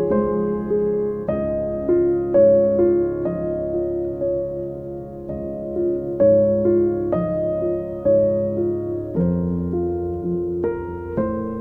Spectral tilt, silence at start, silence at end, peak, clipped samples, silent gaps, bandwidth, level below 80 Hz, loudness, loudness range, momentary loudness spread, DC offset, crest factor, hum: -12.5 dB/octave; 0 s; 0 s; -6 dBFS; under 0.1%; none; 2.7 kHz; -42 dBFS; -21 LUFS; 4 LU; 11 LU; under 0.1%; 14 dB; none